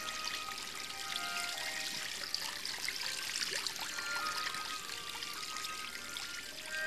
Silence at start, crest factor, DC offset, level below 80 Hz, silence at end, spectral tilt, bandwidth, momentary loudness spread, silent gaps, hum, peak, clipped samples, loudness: 0 s; 22 dB; 0.2%; -70 dBFS; 0 s; 0.5 dB/octave; 14.5 kHz; 5 LU; none; none; -18 dBFS; under 0.1%; -38 LUFS